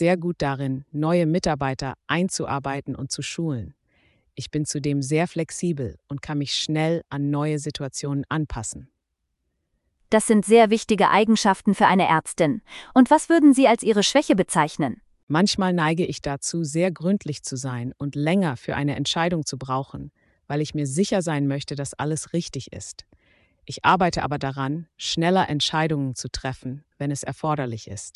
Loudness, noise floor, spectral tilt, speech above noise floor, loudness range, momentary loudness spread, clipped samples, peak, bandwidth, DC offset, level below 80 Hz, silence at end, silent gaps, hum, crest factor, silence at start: -23 LUFS; -77 dBFS; -5 dB/octave; 55 dB; 9 LU; 14 LU; under 0.1%; -2 dBFS; 12 kHz; under 0.1%; -50 dBFS; 0.05 s; 15.23-15.27 s; none; 20 dB; 0 s